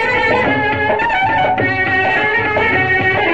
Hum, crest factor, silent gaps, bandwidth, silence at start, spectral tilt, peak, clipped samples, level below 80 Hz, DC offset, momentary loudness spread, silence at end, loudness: none; 12 dB; none; 8.6 kHz; 0 s; -6 dB/octave; -2 dBFS; under 0.1%; -42 dBFS; 0.9%; 2 LU; 0 s; -13 LUFS